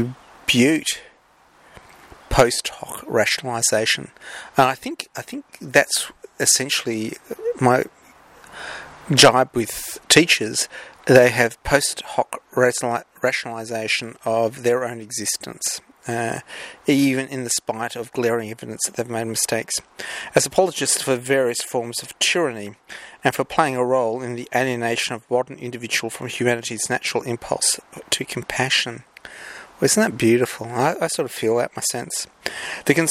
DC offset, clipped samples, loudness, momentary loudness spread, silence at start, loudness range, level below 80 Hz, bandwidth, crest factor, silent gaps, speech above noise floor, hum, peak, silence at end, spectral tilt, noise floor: under 0.1%; under 0.1%; -20 LUFS; 13 LU; 0 s; 5 LU; -48 dBFS; 16 kHz; 22 dB; none; 34 dB; none; 0 dBFS; 0 s; -3 dB/octave; -55 dBFS